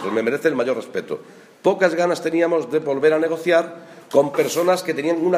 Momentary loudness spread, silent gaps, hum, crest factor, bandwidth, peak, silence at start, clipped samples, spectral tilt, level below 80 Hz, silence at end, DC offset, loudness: 10 LU; none; none; 18 dB; 15.5 kHz; -2 dBFS; 0 s; under 0.1%; -5 dB/octave; -72 dBFS; 0 s; under 0.1%; -20 LUFS